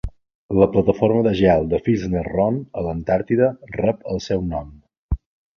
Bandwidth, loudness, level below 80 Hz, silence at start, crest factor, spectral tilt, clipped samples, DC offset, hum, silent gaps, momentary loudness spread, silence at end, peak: 7 kHz; -20 LUFS; -36 dBFS; 0.05 s; 18 dB; -8 dB/octave; under 0.1%; under 0.1%; none; 0.35-0.49 s, 4.98-5.09 s; 13 LU; 0.4 s; -2 dBFS